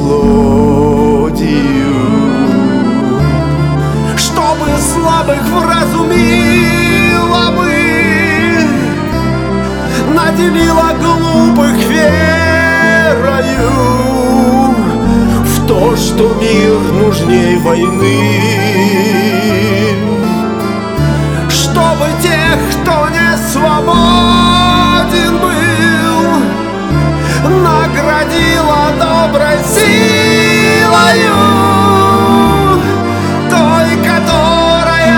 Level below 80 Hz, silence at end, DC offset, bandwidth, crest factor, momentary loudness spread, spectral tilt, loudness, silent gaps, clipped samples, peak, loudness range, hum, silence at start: -24 dBFS; 0 s; 0.4%; 19 kHz; 8 dB; 5 LU; -5 dB/octave; -9 LUFS; none; 0.8%; 0 dBFS; 3 LU; none; 0 s